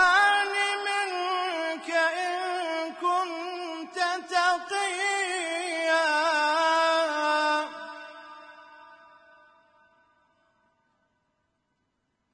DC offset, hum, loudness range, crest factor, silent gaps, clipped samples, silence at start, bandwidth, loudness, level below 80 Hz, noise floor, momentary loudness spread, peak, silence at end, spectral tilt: under 0.1%; none; 7 LU; 18 dB; none; under 0.1%; 0 s; 10.5 kHz; -26 LUFS; -74 dBFS; -76 dBFS; 13 LU; -10 dBFS; 3.4 s; 0.5 dB/octave